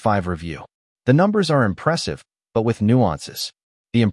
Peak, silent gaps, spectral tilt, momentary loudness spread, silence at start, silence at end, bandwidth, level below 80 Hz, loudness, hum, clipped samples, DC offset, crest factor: -4 dBFS; 0.74-0.96 s, 3.63-3.85 s; -6.5 dB/octave; 13 LU; 0.05 s; 0 s; 12 kHz; -50 dBFS; -20 LUFS; none; under 0.1%; under 0.1%; 16 dB